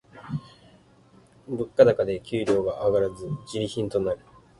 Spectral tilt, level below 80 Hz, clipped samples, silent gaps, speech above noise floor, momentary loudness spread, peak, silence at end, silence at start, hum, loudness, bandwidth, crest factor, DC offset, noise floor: -6.5 dB/octave; -54 dBFS; under 0.1%; none; 32 dB; 16 LU; -4 dBFS; 0.45 s; 0.15 s; none; -25 LUFS; 11.5 kHz; 22 dB; under 0.1%; -56 dBFS